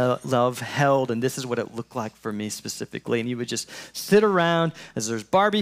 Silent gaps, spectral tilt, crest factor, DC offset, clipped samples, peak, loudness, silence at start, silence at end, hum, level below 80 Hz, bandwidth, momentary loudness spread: none; -5 dB/octave; 16 dB; under 0.1%; under 0.1%; -8 dBFS; -24 LUFS; 0 s; 0 s; none; -66 dBFS; 16 kHz; 12 LU